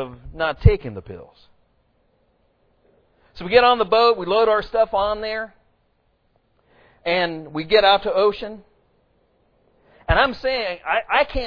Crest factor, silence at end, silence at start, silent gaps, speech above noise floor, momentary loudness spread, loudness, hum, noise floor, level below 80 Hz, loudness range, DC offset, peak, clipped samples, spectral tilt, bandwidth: 22 dB; 0 s; 0 s; none; 45 dB; 19 LU; -19 LUFS; none; -65 dBFS; -34 dBFS; 5 LU; under 0.1%; 0 dBFS; under 0.1%; -7.5 dB/octave; 5.4 kHz